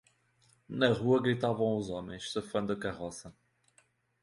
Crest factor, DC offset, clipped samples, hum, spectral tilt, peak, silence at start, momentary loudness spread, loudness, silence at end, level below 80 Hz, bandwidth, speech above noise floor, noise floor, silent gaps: 22 dB; under 0.1%; under 0.1%; none; -6 dB/octave; -12 dBFS; 0.7 s; 14 LU; -32 LUFS; 0.9 s; -62 dBFS; 11.5 kHz; 38 dB; -70 dBFS; none